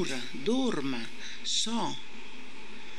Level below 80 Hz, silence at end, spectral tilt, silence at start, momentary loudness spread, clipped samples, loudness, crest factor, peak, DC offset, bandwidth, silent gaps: -68 dBFS; 0 s; -3 dB/octave; 0 s; 17 LU; under 0.1%; -32 LUFS; 18 dB; -14 dBFS; 3%; 12.5 kHz; none